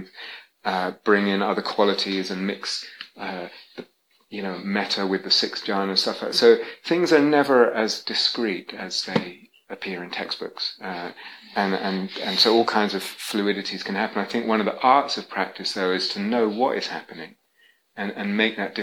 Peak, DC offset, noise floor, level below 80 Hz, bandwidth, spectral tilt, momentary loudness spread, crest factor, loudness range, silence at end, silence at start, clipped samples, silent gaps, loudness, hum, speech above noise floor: -4 dBFS; under 0.1%; -61 dBFS; -76 dBFS; 16.5 kHz; -4 dB/octave; 17 LU; 20 dB; 8 LU; 0 s; 0 s; under 0.1%; none; -23 LUFS; none; 38 dB